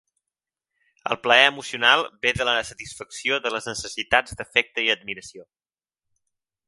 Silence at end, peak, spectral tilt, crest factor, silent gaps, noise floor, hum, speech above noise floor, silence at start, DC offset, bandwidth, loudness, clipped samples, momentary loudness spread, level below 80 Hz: 1.25 s; 0 dBFS; -2 dB/octave; 24 dB; none; -89 dBFS; none; 65 dB; 1.05 s; under 0.1%; 11.5 kHz; -21 LUFS; under 0.1%; 18 LU; -54 dBFS